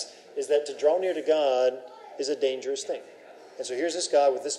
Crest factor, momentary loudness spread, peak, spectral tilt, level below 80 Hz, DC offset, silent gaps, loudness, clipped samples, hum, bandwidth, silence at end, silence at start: 16 dB; 14 LU; -10 dBFS; -1.5 dB/octave; under -90 dBFS; under 0.1%; none; -27 LUFS; under 0.1%; none; 12 kHz; 0 s; 0 s